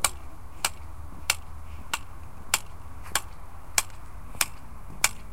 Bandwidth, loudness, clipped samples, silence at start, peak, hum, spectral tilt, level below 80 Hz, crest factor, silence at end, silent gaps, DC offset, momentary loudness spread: 17 kHz; -29 LUFS; under 0.1%; 0 s; -2 dBFS; none; -0.5 dB/octave; -44 dBFS; 30 dB; 0 s; none; 2%; 19 LU